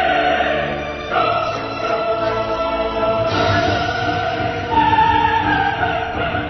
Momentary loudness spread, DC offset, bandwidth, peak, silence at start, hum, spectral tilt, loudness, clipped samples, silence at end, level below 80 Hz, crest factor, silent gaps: 6 LU; under 0.1%; 6.2 kHz; -4 dBFS; 0 s; none; -3 dB/octave; -18 LUFS; under 0.1%; 0 s; -38 dBFS; 14 dB; none